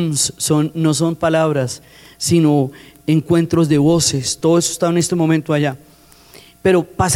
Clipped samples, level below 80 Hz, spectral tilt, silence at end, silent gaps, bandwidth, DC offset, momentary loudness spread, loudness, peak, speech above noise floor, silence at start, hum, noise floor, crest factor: under 0.1%; -48 dBFS; -5 dB/octave; 0 s; none; 16 kHz; under 0.1%; 8 LU; -16 LUFS; -4 dBFS; 28 dB; 0 s; none; -44 dBFS; 12 dB